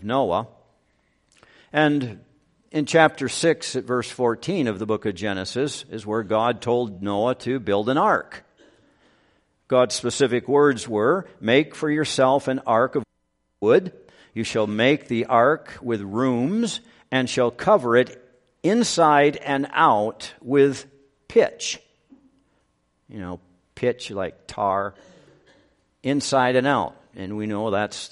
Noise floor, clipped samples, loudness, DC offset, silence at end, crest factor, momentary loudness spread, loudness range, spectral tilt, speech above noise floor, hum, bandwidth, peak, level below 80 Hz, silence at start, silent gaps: -72 dBFS; under 0.1%; -22 LUFS; under 0.1%; 0.05 s; 22 dB; 13 LU; 7 LU; -5 dB/octave; 50 dB; none; 11.5 kHz; 0 dBFS; -62 dBFS; 0 s; none